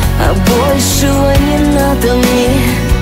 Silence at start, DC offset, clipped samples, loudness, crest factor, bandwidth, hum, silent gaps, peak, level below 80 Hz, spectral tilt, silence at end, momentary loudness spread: 0 s; under 0.1%; under 0.1%; -10 LUFS; 10 dB; 16.5 kHz; none; none; 0 dBFS; -16 dBFS; -5 dB/octave; 0 s; 1 LU